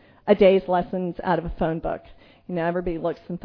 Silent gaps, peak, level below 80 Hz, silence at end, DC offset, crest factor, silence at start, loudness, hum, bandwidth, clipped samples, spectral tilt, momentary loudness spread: none; -4 dBFS; -42 dBFS; 0.05 s; under 0.1%; 20 dB; 0.25 s; -23 LUFS; none; 5.4 kHz; under 0.1%; -9.5 dB/octave; 13 LU